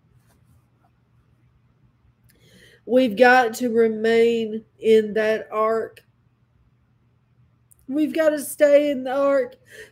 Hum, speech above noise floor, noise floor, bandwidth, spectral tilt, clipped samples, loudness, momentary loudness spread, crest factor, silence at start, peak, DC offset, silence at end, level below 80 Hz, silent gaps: none; 42 dB; -62 dBFS; 16 kHz; -4.5 dB/octave; under 0.1%; -20 LUFS; 10 LU; 20 dB; 2.85 s; -2 dBFS; under 0.1%; 0.1 s; -66 dBFS; none